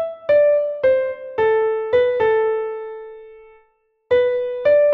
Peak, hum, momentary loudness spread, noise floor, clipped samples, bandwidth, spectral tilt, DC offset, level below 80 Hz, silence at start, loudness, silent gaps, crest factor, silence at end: -6 dBFS; none; 13 LU; -62 dBFS; under 0.1%; 4.9 kHz; -6 dB/octave; under 0.1%; -58 dBFS; 0 s; -18 LUFS; none; 12 dB; 0 s